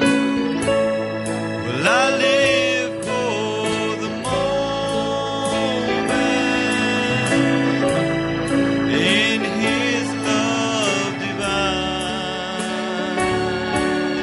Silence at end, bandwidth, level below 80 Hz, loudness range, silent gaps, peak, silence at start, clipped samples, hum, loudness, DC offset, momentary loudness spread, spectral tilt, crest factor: 0 s; 11.5 kHz; -46 dBFS; 3 LU; none; -4 dBFS; 0 s; under 0.1%; none; -19 LUFS; under 0.1%; 7 LU; -4 dB/octave; 16 dB